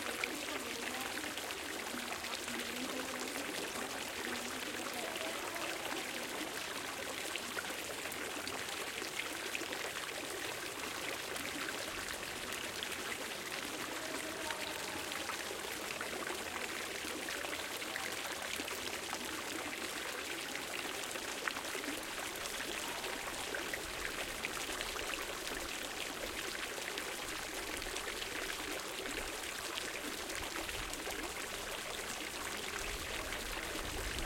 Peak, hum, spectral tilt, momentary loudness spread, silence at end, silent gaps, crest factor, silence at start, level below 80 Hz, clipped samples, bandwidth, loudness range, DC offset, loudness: -16 dBFS; none; -1.5 dB/octave; 1 LU; 0 s; none; 26 dB; 0 s; -60 dBFS; under 0.1%; 17 kHz; 1 LU; under 0.1%; -40 LUFS